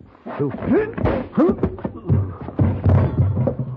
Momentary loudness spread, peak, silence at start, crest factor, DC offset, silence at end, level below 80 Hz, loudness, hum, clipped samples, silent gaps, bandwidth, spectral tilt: 8 LU; -6 dBFS; 0.25 s; 12 dB; under 0.1%; 0 s; -36 dBFS; -20 LUFS; none; under 0.1%; none; 4.2 kHz; -11.5 dB/octave